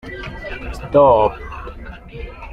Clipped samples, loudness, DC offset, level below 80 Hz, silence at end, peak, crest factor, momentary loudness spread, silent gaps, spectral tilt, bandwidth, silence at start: under 0.1%; -14 LUFS; under 0.1%; -34 dBFS; 0 s; 0 dBFS; 18 dB; 22 LU; none; -7.5 dB/octave; 8.8 kHz; 0.05 s